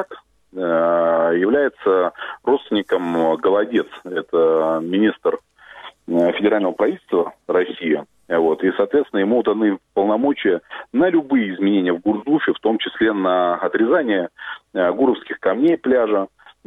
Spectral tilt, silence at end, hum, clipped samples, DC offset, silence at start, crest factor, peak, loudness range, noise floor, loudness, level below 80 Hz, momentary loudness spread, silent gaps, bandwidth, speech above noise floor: -7.5 dB/octave; 0.4 s; none; under 0.1%; under 0.1%; 0 s; 14 dB; -4 dBFS; 1 LU; -42 dBFS; -19 LUFS; -62 dBFS; 7 LU; none; 4 kHz; 24 dB